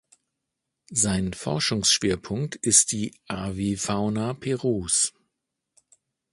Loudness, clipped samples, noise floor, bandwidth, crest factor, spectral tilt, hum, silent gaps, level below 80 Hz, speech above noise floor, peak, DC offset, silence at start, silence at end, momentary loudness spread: -24 LUFS; under 0.1%; -83 dBFS; 11.5 kHz; 24 dB; -3 dB/octave; none; none; -50 dBFS; 58 dB; -2 dBFS; under 0.1%; 0.9 s; 1.25 s; 12 LU